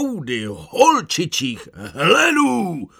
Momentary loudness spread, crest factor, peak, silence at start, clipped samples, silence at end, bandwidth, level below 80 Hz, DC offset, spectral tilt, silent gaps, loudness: 13 LU; 18 dB; -2 dBFS; 0 s; under 0.1%; 0.15 s; 17.5 kHz; -56 dBFS; under 0.1%; -3.5 dB/octave; none; -17 LUFS